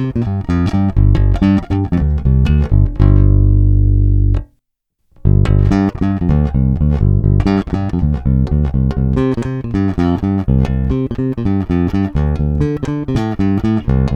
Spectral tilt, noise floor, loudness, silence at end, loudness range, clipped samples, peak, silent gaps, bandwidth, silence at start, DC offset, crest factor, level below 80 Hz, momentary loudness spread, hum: -9.5 dB/octave; -67 dBFS; -15 LUFS; 0 s; 3 LU; under 0.1%; 0 dBFS; none; 6.8 kHz; 0 s; under 0.1%; 12 dB; -18 dBFS; 6 LU; 50 Hz at -25 dBFS